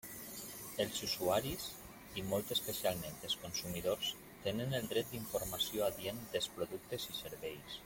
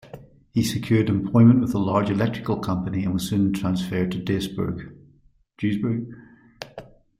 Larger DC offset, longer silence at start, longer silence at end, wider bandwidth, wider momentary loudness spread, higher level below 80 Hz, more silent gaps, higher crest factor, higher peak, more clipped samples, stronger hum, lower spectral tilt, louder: neither; about the same, 0.05 s vs 0.15 s; second, 0 s vs 0.35 s; about the same, 17 kHz vs 15.5 kHz; second, 10 LU vs 23 LU; second, -64 dBFS vs -50 dBFS; neither; about the same, 18 dB vs 18 dB; second, -22 dBFS vs -4 dBFS; neither; neither; second, -3.5 dB/octave vs -7 dB/octave; second, -39 LUFS vs -23 LUFS